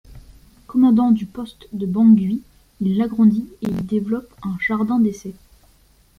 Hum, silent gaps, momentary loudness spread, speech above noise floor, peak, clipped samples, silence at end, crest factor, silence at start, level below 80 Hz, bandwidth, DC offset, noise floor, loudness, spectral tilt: none; none; 16 LU; 36 dB; -4 dBFS; under 0.1%; 0.85 s; 16 dB; 0.1 s; -50 dBFS; 6.6 kHz; under 0.1%; -54 dBFS; -19 LUFS; -8 dB/octave